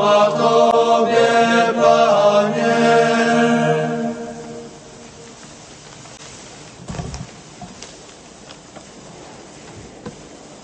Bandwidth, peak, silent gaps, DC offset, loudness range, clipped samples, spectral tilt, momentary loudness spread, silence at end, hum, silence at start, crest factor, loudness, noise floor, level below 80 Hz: 8.8 kHz; -2 dBFS; none; under 0.1%; 21 LU; under 0.1%; -4.5 dB/octave; 25 LU; 0.1 s; none; 0 s; 16 dB; -15 LUFS; -40 dBFS; -50 dBFS